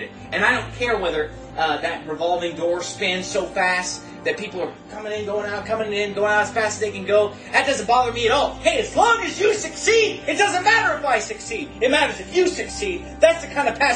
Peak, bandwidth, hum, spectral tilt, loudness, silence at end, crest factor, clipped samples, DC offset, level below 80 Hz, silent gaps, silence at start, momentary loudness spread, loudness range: -2 dBFS; 10 kHz; none; -3 dB/octave; -21 LUFS; 0 s; 20 dB; under 0.1%; under 0.1%; -46 dBFS; none; 0 s; 9 LU; 5 LU